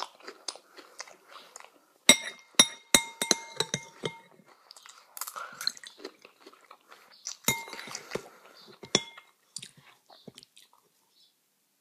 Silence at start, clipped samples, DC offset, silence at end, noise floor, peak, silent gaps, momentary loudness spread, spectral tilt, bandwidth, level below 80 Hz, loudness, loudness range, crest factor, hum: 0 s; under 0.1%; under 0.1%; 2.15 s; -73 dBFS; 0 dBFS; none; 27 LU; -0.5 dB/octave; 15.5 kHz; -68 dBFS; -28 LUFS; 12 LU; 34 dB; none